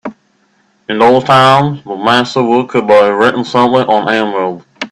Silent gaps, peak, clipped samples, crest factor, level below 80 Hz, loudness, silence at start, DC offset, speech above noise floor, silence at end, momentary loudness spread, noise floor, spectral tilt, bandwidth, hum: none; 0 dBFS; under 0.1%; 10 dB; -52 dBFS; -10 LUFS; 0.05 s; under 0.1%; 45 dB; 0.05 s; 12 LU; -55 dBFS; -5.5 dB/octave; 12 kHz; none